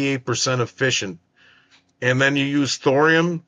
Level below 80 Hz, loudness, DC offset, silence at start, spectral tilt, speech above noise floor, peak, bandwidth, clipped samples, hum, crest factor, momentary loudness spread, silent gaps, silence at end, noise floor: -64 dBFS; -19 LUFS; under 0.1%; 0 s; -4 dB/octave; 37 dB; -4 dBFS; 9.6 kHz; under 0.1%; none; 16 dB; 7 LU; none; 0.1 s; -56 dBFS